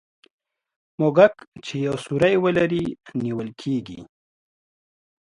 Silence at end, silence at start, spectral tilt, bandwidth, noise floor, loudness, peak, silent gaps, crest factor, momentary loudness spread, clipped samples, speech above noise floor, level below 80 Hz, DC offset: 1.35 s; 1 s; -7 dB/octave; 11.5 kHz; under -90 dBFS; -22 LUFS; -2 dBFS; 1.48-1.52 s; 22 dB; 15 LU; under 0.1%; over 69 dB; -58 dBFS; under 0.1%